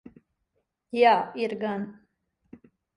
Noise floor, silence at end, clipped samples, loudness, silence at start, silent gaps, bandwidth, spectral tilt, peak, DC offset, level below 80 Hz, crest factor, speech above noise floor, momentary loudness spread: -77 dBFS; 1.05 s; under 0.1%; -25 LUFS; 0.95 s; none; 10.5 kHz; -6 dB/octave; -8 dBFS; under 0.1%; -72 dBFS; 20 dB; 53 dB; 14 LU